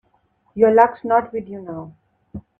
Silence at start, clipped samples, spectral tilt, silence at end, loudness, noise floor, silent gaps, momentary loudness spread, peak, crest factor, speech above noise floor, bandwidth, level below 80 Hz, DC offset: 0.55 s; under 0.1%; -9 dB/octave; 0.2 s; -17 LUFS; -63 dBFS; none; 23 LU; 0 dBFS; 20 dB; 45 dB; 3.8 kHz; -56 dBFS; under 0.1%